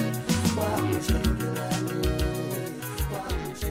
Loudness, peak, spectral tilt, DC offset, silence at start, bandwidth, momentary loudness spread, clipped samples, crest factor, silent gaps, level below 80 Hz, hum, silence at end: -28 LUFS; -12 dBFS; -5.5 dB/octave; under 0.1%; 0 s; 16 kHz; 6 LU; under 0.1%; 16 dB; none; -34 dBFS; none; 0 s